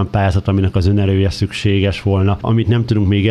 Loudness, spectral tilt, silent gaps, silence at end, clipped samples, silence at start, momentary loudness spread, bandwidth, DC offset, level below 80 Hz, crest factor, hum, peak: -15 LUFS; -7.5 dB/octave; none; 0 s; under 0.1%; 0 s; 2 LU; 9.8 kHz; under 0.1%; -32 dBFS; 12 dB; none; -2 dBFS